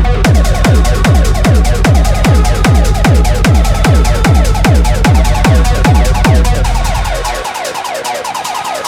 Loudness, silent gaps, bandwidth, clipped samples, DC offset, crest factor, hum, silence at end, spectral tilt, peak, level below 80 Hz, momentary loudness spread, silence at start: -11 LUFS; none; 16 kHz; 0.4%; under 0.1%; 8 dB; none; 0 s; -5.5 dB/octave; 0 dBFS; -10 dBFS; 7 LU; 0 s